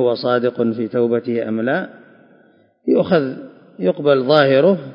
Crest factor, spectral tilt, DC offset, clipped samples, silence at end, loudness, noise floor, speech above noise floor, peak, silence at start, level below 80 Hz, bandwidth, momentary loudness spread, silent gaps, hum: 18 dB; -9 dB/octave; under 0.1%; under 0.1%; 0 s; -17 LUFS; -53 dBFS; 37 dB; 0 dBFS; 0 s; -64 dBFS; 5.4 kHz; 11 LU; none; none